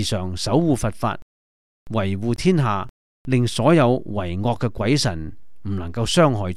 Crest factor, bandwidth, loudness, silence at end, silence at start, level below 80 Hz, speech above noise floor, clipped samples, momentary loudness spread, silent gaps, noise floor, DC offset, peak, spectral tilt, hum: 20 dB; 13.5 kHz; -21 LUFS; 0 s; 0 s; -42 dBFS; over 70 dB; under 0.1%; 14 LU; 1.22-1.86 s, 2.89-3.25 s; under -90 dBFS; 2%; -2 dBFS; -6 dB/octave; none